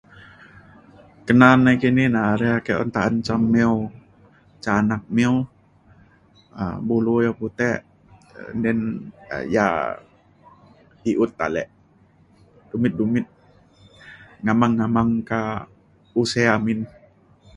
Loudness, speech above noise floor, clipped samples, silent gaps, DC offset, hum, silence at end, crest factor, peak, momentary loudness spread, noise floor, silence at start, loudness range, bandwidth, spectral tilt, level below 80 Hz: -21 LUFS; 36 dB; under 0.1%; none; under 0.1%; none; 0.7 s; 22 dB; 0 dBFS; 15 LU; -55 dBFS; 1.25 s; 8 LU; 11 kHz; -7 dB/octave; -50 dBFS